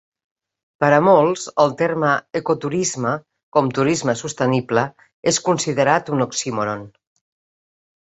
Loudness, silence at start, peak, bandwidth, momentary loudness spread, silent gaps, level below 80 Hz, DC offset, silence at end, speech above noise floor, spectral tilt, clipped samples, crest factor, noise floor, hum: -19 LUFS; 0.8 s; -2 dBFS; 8.4 kHz; 9 LU; 3.43-3.52 s, 5.13-5.23 s; -60 dBFS; under 0.1%; 1.2 s; over 71 dB; -4.5 dB/octave; under 0.1%; 18 dB; under -90 dBFS; none